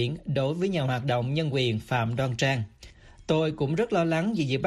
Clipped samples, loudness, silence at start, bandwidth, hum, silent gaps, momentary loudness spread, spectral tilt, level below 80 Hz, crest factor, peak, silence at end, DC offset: under 0.1%; -27 LUFS; 0 s; 12.5 kHz; none; none; 3 LU; -6.5 dB/octave; -54 dBFS; 16 dB; -10 dBFS; 0 s; under 0.1%